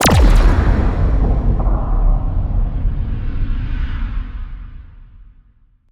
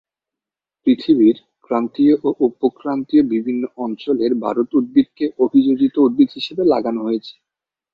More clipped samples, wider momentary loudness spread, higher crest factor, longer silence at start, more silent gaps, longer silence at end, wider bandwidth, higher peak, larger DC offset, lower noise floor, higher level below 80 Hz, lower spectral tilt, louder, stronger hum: neither; first, 16 LU vs 9 LU; about the same, 14 dB vs 16 dB; second, 0 s vs 0.85 s; neither; about the same, 0.7 s vs 0.6 s; first, over 20 kHz vs 5.4 kHz; about the same, -2 dBFS vs -2 dBFS; neither; second, -51 dBFS vs -87 dBFS; first, -16 dBFS vs -58 dBFS; second, -5.5 dB/octave vs -8.5 dB/octave; about the same, -19 LUFS vs -17 LUFS; neither